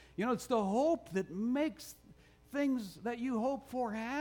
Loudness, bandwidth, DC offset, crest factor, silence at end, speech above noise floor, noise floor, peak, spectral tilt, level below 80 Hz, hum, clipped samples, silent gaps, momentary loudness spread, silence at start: -36 LUFS; 19.5 kHz; under 0.1%; 16 dB; 0 s; 26 dB; -61 dBFS; -20 dBFS; -6 dB/octave; -66 dBFS; none; under 0.1%; none; 8 LU; 0 s